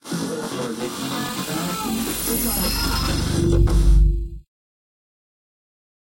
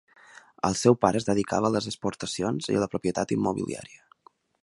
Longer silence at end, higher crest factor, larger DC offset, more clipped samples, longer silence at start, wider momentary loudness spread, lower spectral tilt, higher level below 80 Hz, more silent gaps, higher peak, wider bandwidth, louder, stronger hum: first, 1.65 s vs 0.75 s; second, 16 dB vs 24 dB; neither; neither; second, 0.05 s vs 0.65 s; about the same, 9 LU vs 10 LU; about the same, -4.5 dB/octave vs -5.5 dB/octave; first, -24 dBFS vs -56 dBFS; neither; about the same, -6 dBFS vs -4 dBFS; first, 16.5 kHz vs 11.5 kHz; first, -22 LUFS vs -26 LUFS; neither